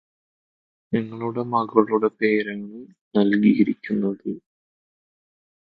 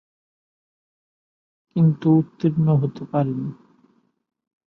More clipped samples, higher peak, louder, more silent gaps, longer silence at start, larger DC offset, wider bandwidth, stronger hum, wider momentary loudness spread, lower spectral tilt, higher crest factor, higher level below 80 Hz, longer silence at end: neither; first, -2 dBFS vs -6 dBFS; about the same, -22 LUFS vs -21 LUFS; first, 3.01-3.11 s vs none; second, 0.9 s vs 1.75 s; neither; first, 4.8 kHz vs 4.3 kHz; neither; first, 16 LU vs 11 LU; second, -10 dB/octave vs -11.5 dB/octave; about the same, 22 dB vs 18 dB; about the same, -66 dBFS vs -62 dBFS; first, 1.3 s vs 1.15 s